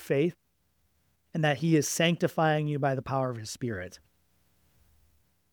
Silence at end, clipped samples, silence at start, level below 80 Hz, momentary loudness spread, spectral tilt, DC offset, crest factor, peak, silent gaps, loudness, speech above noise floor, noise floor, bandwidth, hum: 1.55 s; under 0.1%; 0 s; -66 dBFS; 10 LU; -5 dB/octave; under 0.1%; 20 dB; -10 dBFS; none; -28 LUFS; 45 dB; -73 dBFS; over 20 kHz; none